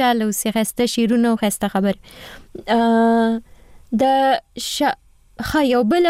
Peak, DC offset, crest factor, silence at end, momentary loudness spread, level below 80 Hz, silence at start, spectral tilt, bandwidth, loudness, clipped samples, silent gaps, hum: -8 dBFS; under 0.1%; 10 dB; 0 s; 15 LU; -48 dBFS; 0 s; -4.5 dB/octave; 16 kHz; -18 LUFS; under 0.1%; none; none